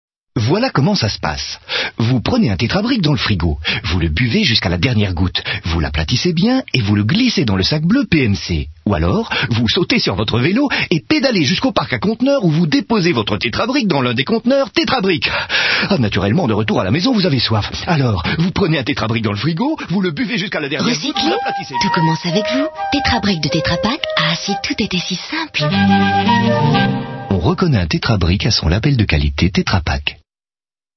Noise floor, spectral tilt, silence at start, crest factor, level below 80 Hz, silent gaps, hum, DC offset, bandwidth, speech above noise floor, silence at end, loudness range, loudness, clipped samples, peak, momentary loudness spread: under -90 dBFS; -5.5 dB/octave; 0.35 s; 16 dB; -32 dBFS; none; none; under 0.1%; 6.4 kHz; over 75 dB; 0.8 s; 2 LU; -16 LUFS; under 0.1%; 0 dBFS; 5 LU